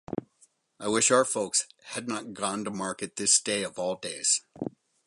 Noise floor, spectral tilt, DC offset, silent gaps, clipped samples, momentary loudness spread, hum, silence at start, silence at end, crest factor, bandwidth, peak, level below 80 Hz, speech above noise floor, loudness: -65 dBFS; -2 dB/octave; under 0.1%; none; under 0.1%; 15 LU; none; 0.1 s; 0.4 s; 20 dB; 11.5 kHz; -8 dBFS; -68 dBFS; 37 dB; -27 LUFS